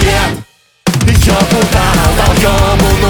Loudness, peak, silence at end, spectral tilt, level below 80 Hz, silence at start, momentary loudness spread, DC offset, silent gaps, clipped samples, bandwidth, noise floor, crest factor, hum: -10 LUFS; 0 dBFS; 0 s; -5 dB/octave; -16 dBFS; 0 s; 7 LU; under 0.1%; none; under 0.1%; over 20 kHz; -32 dBFS; 10 dB; none